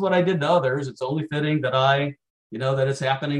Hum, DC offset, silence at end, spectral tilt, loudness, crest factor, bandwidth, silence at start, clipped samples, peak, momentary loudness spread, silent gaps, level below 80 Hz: none; under 0.1%; 0 s; -6.5 dB/octave; -23 LUFS; 16 dB; 10.5 kHz; 0 s; under 0.1%; -6 dBFS; 8 LU; 2.30-2.50 s; -66 dBFS